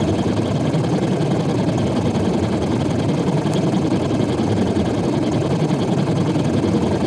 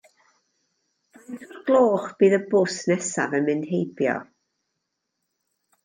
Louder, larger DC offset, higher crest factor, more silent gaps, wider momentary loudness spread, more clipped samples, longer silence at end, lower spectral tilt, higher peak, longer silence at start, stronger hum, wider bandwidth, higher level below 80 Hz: first, -19 LUFS vs -22 LUFS; neither; second, 12 dB vs 18 dB; neither; second, 1 LU vs 13 LU; neither; second, 0 s vs 1.6 s; first, -7 dB/octave vs -5.5 dB/octave; about the same, -6 dBFS vs -6 dBFS; second, 0 s vs 1.3 s; neither; first, 11.5 kHz vs 10 kHz; first, -40 dBFS vs -74 dBFS